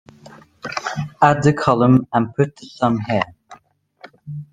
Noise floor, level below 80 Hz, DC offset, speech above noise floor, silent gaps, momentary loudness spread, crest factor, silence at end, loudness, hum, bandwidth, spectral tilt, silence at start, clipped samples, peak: -52 dBFS; -54 dBFS; under 0.1%; 35 dB; none; 14 LU; 18 dB; 0.1 s; -18 LUFS; none; 9.4 kHz; -7 dB/octave; 0.65 s; under 0.1%; -2 dBFS